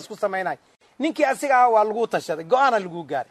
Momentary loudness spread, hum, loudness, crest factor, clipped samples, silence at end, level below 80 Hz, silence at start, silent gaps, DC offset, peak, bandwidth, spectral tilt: 12 LU; none; -21 LUFS; 16 dB; under 0.1%; 0.1 s; -74 dBFS; 0 s; none; under 0.1%; -6 dBFS; 13.5 kHz; -4.5 dB/octave